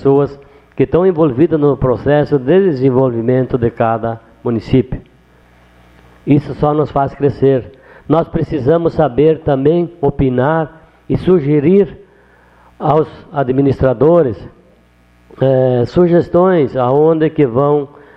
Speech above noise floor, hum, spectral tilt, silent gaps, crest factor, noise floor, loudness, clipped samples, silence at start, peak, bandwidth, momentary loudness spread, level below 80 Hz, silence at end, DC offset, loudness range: 37 dB; 60 Hz at -45 dBFS; -10.5 dB/octave; none; 14 dB; -49 dBFS; -13 LUFS; under 0.1%; 0 s; 0 dBFS; 5.8 kHz; 8 LU; -38 dBFS; 0.3 s; under 0.1%; 4 LU